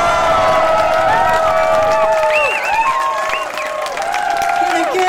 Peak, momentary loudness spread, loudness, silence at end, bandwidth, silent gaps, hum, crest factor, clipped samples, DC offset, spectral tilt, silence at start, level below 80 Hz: -6 dBFS; 6 LU; -14 LUFS; 0 s; 17 kHz; none; none; 10 dB; under 0.1%; under 0.1%; -3 dB/octave; 0 s; -40 dBFS